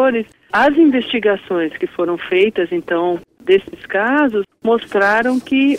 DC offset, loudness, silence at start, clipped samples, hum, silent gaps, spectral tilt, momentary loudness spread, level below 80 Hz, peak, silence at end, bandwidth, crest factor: under 0.1%; -16 LUFS; 0 s; under 0.1%; none; none; -6 dB/octave; 7 LU; -56 dBFS; -2 dBFS; 0 s; 11 kHz; 14 dB